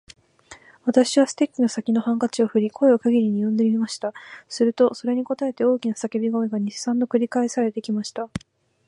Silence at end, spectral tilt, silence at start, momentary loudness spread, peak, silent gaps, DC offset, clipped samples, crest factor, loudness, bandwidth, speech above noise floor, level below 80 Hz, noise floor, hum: 0.5 s; -5.5 dB/octave; 0.5 s; 10 LU; -4 dBFS; none; under 0.1%; under 0.1%; 18 dB; -22 LUFS; 11 kHz; 27 dB; -62 dBFS; -49 dBFS; none